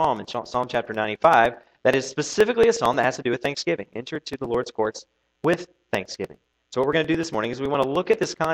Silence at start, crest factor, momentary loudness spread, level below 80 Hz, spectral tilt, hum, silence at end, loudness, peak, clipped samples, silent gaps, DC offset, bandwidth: 0 s; 20 dB; 13 LU; -56 dBFS; -4.5 dB/octave; none; 0 s; -23 LUFS; -2 dBFS; under 0.1%; none; under 0.1%; 16.5 kHz